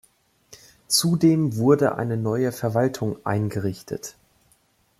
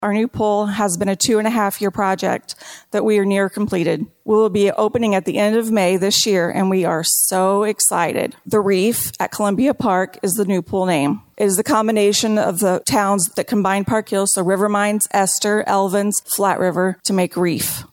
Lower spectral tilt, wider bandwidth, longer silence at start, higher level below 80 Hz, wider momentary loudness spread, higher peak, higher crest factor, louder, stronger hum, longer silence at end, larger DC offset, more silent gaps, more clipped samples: first, -5.5 dB/octave vs -4 dB/octave; second, 15.5 kHz vs 17.5 kHz; first, 0.5 s vs 0 s; second, -60 dBFS vs -54 dBFS; first, 13 LU vs 5 LU; second, -6 dBFS vs -2 dBFS; about the same, 18 dB vs 14 dB; second, -22 LUFS vs -17 LUFS; neither; first, 0.9 s vs 0.05 s; neither; neither; neither